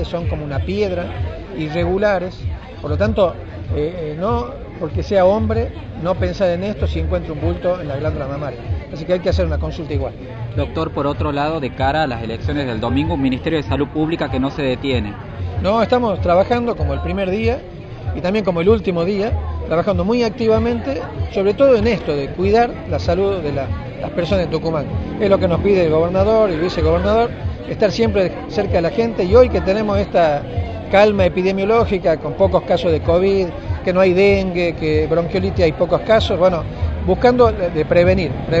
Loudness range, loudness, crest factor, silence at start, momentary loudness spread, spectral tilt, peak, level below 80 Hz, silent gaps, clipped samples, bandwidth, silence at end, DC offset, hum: 5 LU; -18 LUFS; 16 dB; 0 s; 10 LU; -7.5 dB/octave; 0 dBFS; -30 dBFS; none; under 0.1%; 7.8 kHz; 0 s; under 0.1%; none